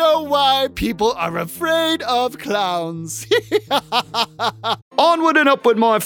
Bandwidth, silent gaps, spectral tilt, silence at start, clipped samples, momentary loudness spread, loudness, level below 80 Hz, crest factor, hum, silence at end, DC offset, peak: 19 kHz; 4.82-4.91 s; -3.5 dB/octave; 0 s; under 0.1%; 9 LU; -18 LUFS; -46 dBFS; 18 dB; none; 0 s; under 0.1%; 0 dBFS